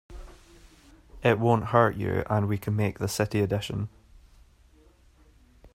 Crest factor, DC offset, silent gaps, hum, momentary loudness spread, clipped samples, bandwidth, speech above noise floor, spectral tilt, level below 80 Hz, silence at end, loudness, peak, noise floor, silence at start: 22 dB; under 0.1%; none; none; 12 LU; under 0.1%; 16 kHz; 33 dB; -6.5 dB/octave; -52 dBFS; 0.1 s; -26 LUFS; -6 dBFS; -58 dBFS; 0.1 s